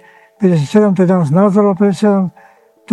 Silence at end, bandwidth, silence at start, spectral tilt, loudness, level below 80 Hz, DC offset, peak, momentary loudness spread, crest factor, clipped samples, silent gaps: 0 s; 10.5 kHz; 0.4 s; -8.5 dB/octave; -12 LUFS; -56 dBFS; under 0.1%; 0 dBFS; 6 LU; 12 dB; under 0.1%; none